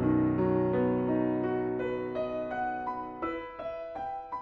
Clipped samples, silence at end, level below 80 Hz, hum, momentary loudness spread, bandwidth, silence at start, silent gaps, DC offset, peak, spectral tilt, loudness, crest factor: under 0.1%; 0 s; -56 dBFS; none; 10 LU; 5 kHz; 0 s; none; under 0.1%; -16 dBFS; -10 dB/octave; -31 LUFS; 14 dB